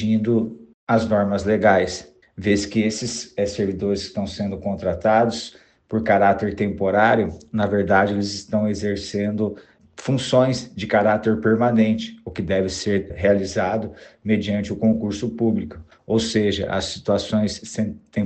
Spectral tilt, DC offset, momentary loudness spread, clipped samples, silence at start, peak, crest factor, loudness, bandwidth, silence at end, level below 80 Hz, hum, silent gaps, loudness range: -5.5 dB/octave; under 0.1%; 10 LU; under 0.1%; 0 s; -2 dBFS; 20 dB; -21 LUFS; 8.8 kHz; 0 s; -48 dBFS; none; 0.74-0.87 s; 3 LU